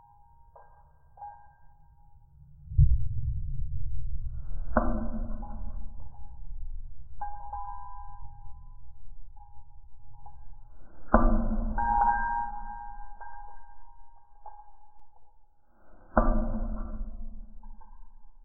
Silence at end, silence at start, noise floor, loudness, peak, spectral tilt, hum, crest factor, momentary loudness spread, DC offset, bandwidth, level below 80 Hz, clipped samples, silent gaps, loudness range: 0.05 s; 0.55 s; -56 dBFS; -32 LUFS; -6 dBFS; -13.5 dB/octave; none; 24 dB; 27 LU; under 0.1%; 1.8 kHz; -34 dBFS; under 0.1%; none; 16 LU